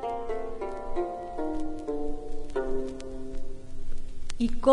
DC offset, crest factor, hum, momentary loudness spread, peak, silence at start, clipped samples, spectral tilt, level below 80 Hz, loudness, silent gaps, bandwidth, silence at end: under 0.1%; 20 dB; none; 12 LU; -8 dBFS; 0 s; under 0.1%; -6.5 dB/octave; -36 dBFS; -35 LUFS; none; 9.8 kHz; 0 s